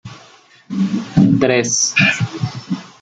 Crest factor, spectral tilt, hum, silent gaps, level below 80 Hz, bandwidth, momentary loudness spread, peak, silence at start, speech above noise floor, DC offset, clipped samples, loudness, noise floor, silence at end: 16 dB; -4 dB/octave; none; none; -50 dBFS; 9.2 kHz; 13 LU; -2 dBFS; 0.05 s; 30 dB; under 0.1%; under 0.1%; -15 LUFS; -46 dBFS; 0.15 s